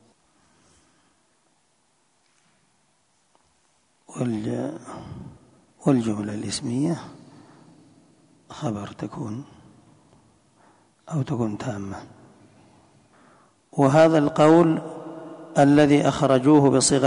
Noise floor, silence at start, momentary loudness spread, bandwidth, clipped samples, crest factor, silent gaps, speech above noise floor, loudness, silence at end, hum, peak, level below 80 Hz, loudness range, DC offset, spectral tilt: -67 dBFS; 4.1 s; 22 LU; 11 kHz; under 0.1%; 18 dB; none; 46 dB; -21 LUFS; 0 s; none; -6 dBFS; -58 dBFS; 17 LU; under 0.1%; -6 dB/octave